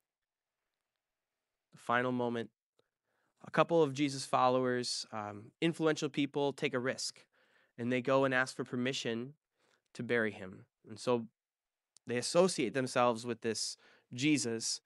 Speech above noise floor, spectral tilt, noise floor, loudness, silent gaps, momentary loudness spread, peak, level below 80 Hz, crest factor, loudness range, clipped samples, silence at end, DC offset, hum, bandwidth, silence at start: over 56 dB; -4 dB/octave; under -90 dBFS; -34 LUFS; 2.62-2.73 s, 9.37-9.41 s; 16 LU; -12 dBFS; -82 dBFS; 24 dB; 5 LU; under 0.1%; 0.05 s; under 0.1%; none; 12 kHz; 1.85 s